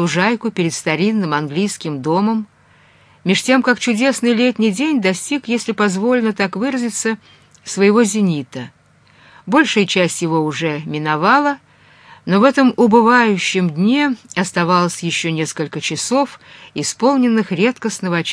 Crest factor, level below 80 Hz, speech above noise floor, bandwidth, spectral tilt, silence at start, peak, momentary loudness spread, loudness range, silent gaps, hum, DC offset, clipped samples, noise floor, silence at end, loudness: 16 dB; -64 dBFS; 34 dB; 11 kHz; -4.5 dB/octave; 0 s; 0 dBFS; 10 LU; 4 LU; none; none; under 0.1%; under 0.1%; -50 dBFS; 0 s; -16 LUFS